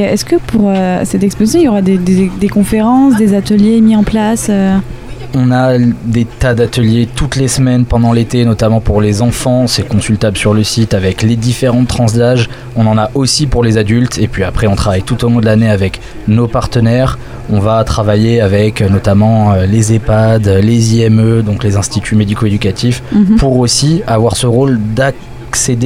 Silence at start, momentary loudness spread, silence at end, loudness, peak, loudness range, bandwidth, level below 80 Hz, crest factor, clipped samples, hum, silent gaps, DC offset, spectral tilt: 0 s; 5 LU; 0 s; -10 LUFS; 0 dBFS; 2 LU; 15.5 kHz; -26 dBFS; 10 dB; under 0.1%; none; none; under 0.1%; -6 dB/octave